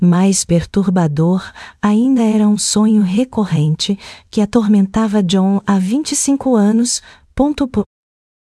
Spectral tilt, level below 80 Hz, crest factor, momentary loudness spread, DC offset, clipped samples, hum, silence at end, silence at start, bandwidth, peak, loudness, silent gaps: -5.5 dB/octave; -42 dBFS; 14 dB; 7 LU; under 0.1%; under 0.1%; none; 0.6 s; 0 s; 12 kHz; 0 dBFS; -14 LUFS; none